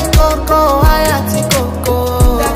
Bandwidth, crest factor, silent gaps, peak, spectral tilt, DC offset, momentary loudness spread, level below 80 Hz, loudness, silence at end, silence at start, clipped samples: 16.5 kHz; 10 dB; none; 0 dBFS; -5 dB/octave; under 0.1%; 5 LU; -16 dBFS; -12 LUFS; 0 s; 0 s; under 0.1%